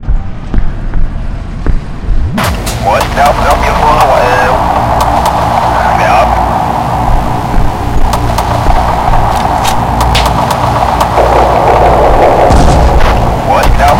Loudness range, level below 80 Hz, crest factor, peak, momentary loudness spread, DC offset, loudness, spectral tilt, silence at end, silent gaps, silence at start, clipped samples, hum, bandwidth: 4 LU; -12 dBFS; 8 dB; 0 dBFS; 11 LU; under 0.1%; -9 LUFS; -5.5 dB/octave; 0 s; none; 0 s; 2%; none; 16.5 kHz